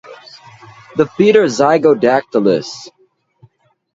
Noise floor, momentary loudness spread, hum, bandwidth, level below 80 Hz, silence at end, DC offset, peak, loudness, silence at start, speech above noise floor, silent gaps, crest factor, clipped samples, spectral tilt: -50 dBFS; 13 LU; none; 7.8 kHz; -58 dBFS; 1.05 s; under 0.1%; 0 dBFS; -13 LUFS; 0.1 s; 38 dB; none; 16 dB; under 0.1%; -5.5 dB/octave